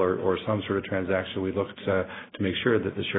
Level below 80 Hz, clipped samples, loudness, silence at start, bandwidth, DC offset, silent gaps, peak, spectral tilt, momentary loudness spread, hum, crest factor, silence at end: -60 dBFS; under 0.1%; -28 LUFS; 0 s; 4 kHz; under 0.1%; none; -10 dBFS; -10 dB/octave; 5 LU; none; 18 dB; 0 s